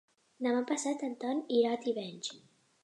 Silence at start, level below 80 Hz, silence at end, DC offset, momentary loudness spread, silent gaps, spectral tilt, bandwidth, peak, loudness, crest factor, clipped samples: 0.4 s; -88 dBFS; 0.45 s; under 0.1%; 10 LU; none; -3.5 dB/octave; 11 kHz; -18 dBFS; -34 LUFS; 18 dB; under 0.1%